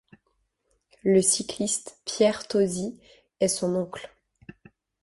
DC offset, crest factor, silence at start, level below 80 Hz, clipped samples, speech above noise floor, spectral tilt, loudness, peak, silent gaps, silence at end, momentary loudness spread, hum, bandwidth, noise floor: under 0.1%; 20 dB; 1.05 s; -64 dBFS; under 0.1%; 48 dB; -4 dB/octave; -25 LUFS; -8 dBFS; none; 0.95 s; 15 LU; none; 12 kHz; -73 dBFS